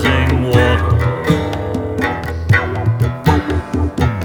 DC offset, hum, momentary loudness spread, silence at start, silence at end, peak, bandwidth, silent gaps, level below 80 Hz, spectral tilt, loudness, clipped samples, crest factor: under 0.1%; none; 7 LU; 0 s; 0 s; 0 dBFS; 20 kHz; none; -26 dBFS; -7 dB/octave; -16 LUFS; under 0.1%; 14 dB